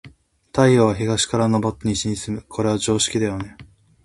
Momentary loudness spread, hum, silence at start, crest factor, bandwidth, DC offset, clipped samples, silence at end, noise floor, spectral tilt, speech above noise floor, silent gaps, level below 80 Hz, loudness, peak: 12 LU; none; 0.05 s; 20 dB; 11.5 kHz; under 0.1%; under 0.1%; 0.4 s; -48 dBFS; -5 dB/octave; 29 dB; none; -46 dBFS; -20 LUFS; 0 dBFS